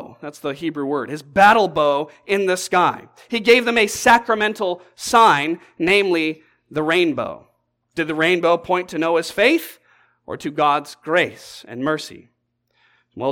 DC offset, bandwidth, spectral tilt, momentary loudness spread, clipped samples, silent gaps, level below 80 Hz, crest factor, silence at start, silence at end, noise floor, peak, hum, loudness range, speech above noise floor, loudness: under 0.1%; 17.5 kHz; -3.5 dB/octave; 15 LU; under 0.1%; none; -56 dBFS; 18 dB; 0 s; 0 s; -67 dBFS; -2 dBFS; none; 5 LU; 49 dB; -18 LUFS